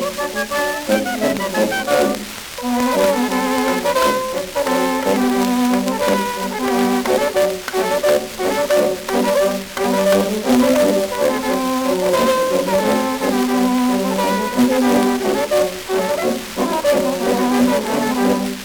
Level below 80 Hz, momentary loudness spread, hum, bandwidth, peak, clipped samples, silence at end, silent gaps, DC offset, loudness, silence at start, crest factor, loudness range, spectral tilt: -46 dBFS; 5 LU; none; over 20 kHz; -2 dBFS; under 0.1%; 0 s; none; under 0.1%; -17 LUFS; 0 s; 16 dB; 1 LU; -4 dB/octave